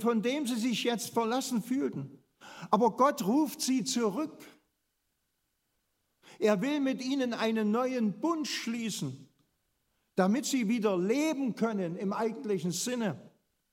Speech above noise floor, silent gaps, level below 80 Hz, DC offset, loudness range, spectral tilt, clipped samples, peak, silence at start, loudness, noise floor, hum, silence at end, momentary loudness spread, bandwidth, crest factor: 50 dB; none; -82 dBFS; under 0.1%; 4 LU; -4.5 dB/octave; under 0.1%; -10 dBFS; 0 s; -31 LUFS; -80 dBFS; none; 0.45 s; 9 LU; 16 kHz; 22 dB